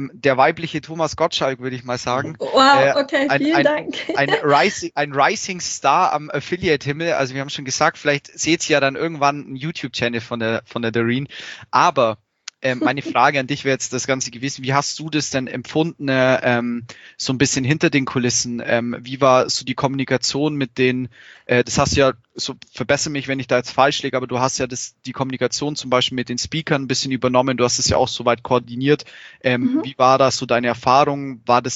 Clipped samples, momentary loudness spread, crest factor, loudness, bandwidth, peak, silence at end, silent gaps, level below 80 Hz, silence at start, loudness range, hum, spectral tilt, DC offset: under 0.1%; 10 LU; 18 dB; -19 LUFS; 8.2 kHz; 0 dBFS; 0 s; none; -50 dBFS; 0 s; 3 LU; none; -4 dB/octave; under 0.1%